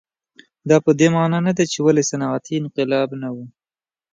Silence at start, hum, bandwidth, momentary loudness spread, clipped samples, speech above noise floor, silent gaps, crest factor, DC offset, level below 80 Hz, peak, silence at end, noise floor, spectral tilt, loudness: 0.65 s; none; 9.4 kHz; 13 LU; under 0.1%; over 72 dB; none; 18 dB; under 0.1%; -64 dBFS; 0 dBFS; 0.65 s; under -90 dBFS; -5.5 dB/octave; -18 LUFS